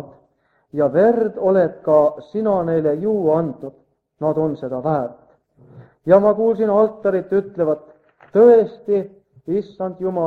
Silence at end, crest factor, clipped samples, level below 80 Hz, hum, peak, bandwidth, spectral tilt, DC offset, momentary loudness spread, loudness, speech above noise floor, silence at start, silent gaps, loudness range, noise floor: 0 s; 18 dB; under 0.1%; -60 dBFS; none; 0 dBFS; 4.5 kHz; -10 dB/octave; under 0.1%; 13 LU; -18 LUFS; 45 dB; 0 s; none; 5 LU; -62 dBFS